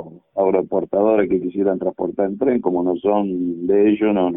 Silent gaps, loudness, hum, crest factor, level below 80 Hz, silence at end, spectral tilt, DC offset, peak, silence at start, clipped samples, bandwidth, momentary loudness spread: none; -19 LUFS; none; 14 dB; -56 dBFS; 0 s; -12.5 dB/octave; under 0.1%; -4 dBFS; 0 s; under 0.1%; 3.7 kHz; 6 LU